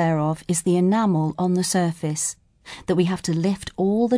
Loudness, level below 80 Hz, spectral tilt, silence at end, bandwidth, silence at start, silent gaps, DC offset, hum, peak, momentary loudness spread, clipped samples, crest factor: -22 LUFS; -54 dBFS; -5.5 dB/octave; 0 s; 11 kHz; 0 s; none; under 0.1%; none; -8 dBFS; 7 LU; under 0.1%; 14 dB